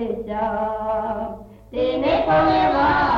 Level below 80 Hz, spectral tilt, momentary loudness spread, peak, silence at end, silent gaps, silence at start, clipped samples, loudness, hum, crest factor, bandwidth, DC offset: -40 dBFS; -7.5 dB/octave; 13 LU; -8 dBFS; 0 s; none; 0 s; under 0.1%; -20 LUFS; none; 12 dB; 7 kHz; under 0.1%